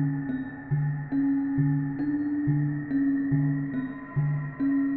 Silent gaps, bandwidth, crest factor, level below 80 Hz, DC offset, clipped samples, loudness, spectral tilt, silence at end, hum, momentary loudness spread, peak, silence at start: none; 3.8 kHz; 12 dB; -54 dBFS; under 0.1%; under 0.1%; -28 LUFS; -11 dB/octave; 0 s; none; 6 LU; -14 dBFS; 0 s